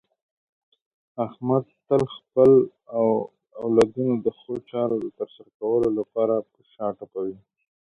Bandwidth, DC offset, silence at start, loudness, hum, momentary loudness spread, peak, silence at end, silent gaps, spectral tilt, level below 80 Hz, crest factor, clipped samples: 11 kHz; under 0.1%; 1.15 s; -24 LUFS; none; 14 LU; -6 dBFS; 0.5 s; 5.54-5.60 s; -8 dB/octave; -60 dBFS; 18 dB; under 0.1%